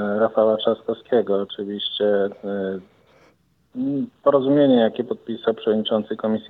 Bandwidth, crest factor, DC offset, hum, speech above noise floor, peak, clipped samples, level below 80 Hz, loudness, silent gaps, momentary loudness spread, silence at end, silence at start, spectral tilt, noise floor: 4.7 kHz; 16 dB; under 0.1%; none; 39 dB; -4 dBFS; under 0.1%; -70 dBFS; -21 LUFS; none; 12 LU; 0 s; 0 s; -8.5 dB/octave; -60 dBFS